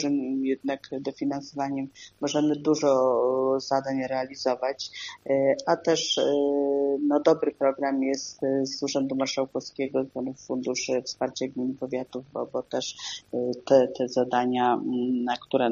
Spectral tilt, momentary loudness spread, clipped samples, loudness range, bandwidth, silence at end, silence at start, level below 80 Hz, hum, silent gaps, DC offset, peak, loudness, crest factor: -3.5 dB/octave; 10 LU; under 0.1%; 6 LU; 7.4 kHz; 0 s; 0 s; -70 dBFS; none; none; under 0.1%; -6 dBFS; -27 LUFS; 20 dB